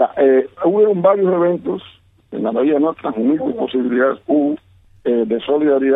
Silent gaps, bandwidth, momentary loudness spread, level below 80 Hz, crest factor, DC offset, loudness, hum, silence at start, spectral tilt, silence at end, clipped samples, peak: none; 3.9 kHz; 10 LU; -60 dBFS; 14 dB; under 0.1%; -17 LUFS; none; 0 s; -10 dB/octave; 0 s; under 0.1%; -2 dBFS